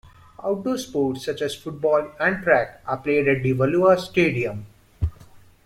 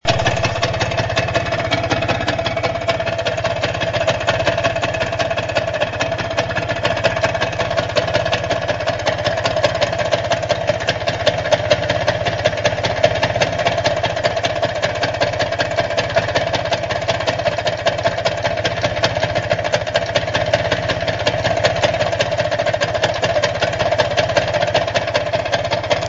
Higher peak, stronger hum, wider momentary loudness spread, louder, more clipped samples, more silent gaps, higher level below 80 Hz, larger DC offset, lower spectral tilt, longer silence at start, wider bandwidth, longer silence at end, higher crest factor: second, -4 dBFS vs 0 dBFS; neither; first, 12 LU vs 3 LU; second, -22 LUFS vs -18 LUFS; neither; neither; second, -44 dBFS vs -38 dBFS; neither; first, -6.5 dB/octave vs -4 dB/octave; first, 0.4 s vs 0.05 s; first, 15.5 kHz vs 8 kHz; first, 0.3 s vs 0 s; about the same, 18 dB vs 18 dB